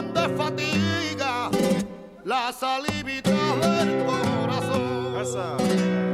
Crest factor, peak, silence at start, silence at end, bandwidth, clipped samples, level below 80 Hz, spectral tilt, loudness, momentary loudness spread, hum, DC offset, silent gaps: 16 dB; -8 dBFS; 0 s; 0 s; 15 kHz; under 0.1%; -56 dBFS; -5 dB/octave; -24 LUFS; 6 LU; none; under 0.1%; none